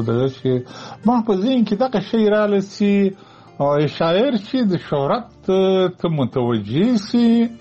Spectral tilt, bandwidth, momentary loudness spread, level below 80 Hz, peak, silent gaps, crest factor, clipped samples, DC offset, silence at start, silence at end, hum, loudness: -7.5 dB/octave; 8 kHz; 6 LU; -54 dBFS; -4 dBFS; none; 14 dB; under 0.1%; under 0.1%; 0 s; 0.05 s; none; -18 LUFS